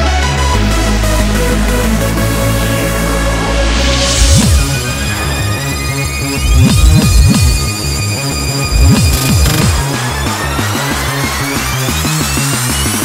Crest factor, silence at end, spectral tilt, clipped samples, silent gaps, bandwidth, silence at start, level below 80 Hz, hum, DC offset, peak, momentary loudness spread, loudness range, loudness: 12 dB; 0 s; -4 dB/octave; 0.3%; none; 16.5 kHz; 0 s; -16 dBFS; none; under 0.1%; 0 dBFS; 6 LU; 2 LU; -12 LUFS